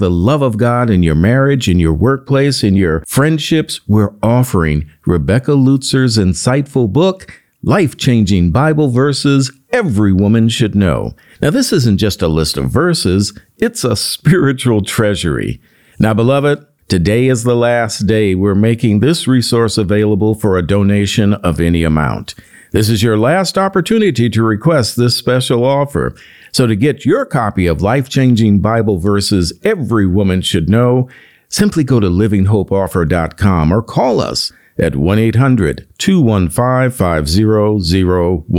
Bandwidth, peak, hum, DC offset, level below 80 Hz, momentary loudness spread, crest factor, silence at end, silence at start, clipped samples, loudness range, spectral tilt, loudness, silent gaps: 17 kHz; 0 dBFS; none; 0.4%; -34 dBFS; 5 LU; 12 dB; 0 s; 0 s; under 0.1%; 2 LU; -6 dB/octave; -13 LUFS; none